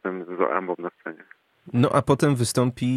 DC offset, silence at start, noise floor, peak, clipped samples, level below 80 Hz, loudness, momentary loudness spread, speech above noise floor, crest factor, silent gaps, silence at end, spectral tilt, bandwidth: under 0.1%; 0.05 s; -53 dBFS; -6 dBFS; under 0.1%; -56 dBFS; -23 LUFS; 14 LU; 31 dB; 18 dB; none; 0 s; -6 dB/octave; 14.5 kHz